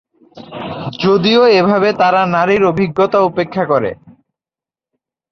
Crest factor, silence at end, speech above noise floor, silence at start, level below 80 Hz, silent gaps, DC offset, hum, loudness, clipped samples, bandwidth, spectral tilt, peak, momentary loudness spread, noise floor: 14 dB; 1.2 s; 78 dB; 0.35 s; -52 dBFS; none; under 0.1%; none; -13 LUFS; under 0.1%; 6.6 kHz; -6.5 dB/octave; -2 dBFS; 15 LU; -90 dBFS